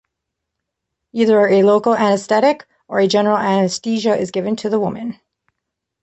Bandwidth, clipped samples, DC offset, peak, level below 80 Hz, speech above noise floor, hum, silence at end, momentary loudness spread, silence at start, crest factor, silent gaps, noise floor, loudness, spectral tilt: 8.4 kHz; under 0.1%; under 0.1%; -2 dBFS; -62 dBFS; 64 dB; none; 0.9 s; 11 LU; 1.15 s; 14 dB; none; -79 dBFS; -16 LUFS; -5.5 dB/octave